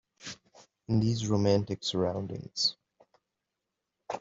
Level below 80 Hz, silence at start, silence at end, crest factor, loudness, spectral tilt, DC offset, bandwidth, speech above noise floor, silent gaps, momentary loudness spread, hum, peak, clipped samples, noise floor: -62 dBFS; 0.2 s; 0 s; 20 dB; -30 LUFS; -5.5 dB/octave; under 0.1%; 7.8 kHz; 57 dB; none; 17 LU; none; -12 dBFS; under 0.1%; -86 dBFS